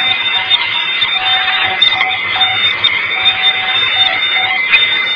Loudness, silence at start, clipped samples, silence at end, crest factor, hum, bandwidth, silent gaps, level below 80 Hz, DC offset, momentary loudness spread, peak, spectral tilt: -10 LUFS; 0 s; under 0.1%; 0 s; 12 dB; none; 5.4 kHz; none; -52 dBFS; under 0.1%; 3 LU; 0 dBFS; -2 dB/octave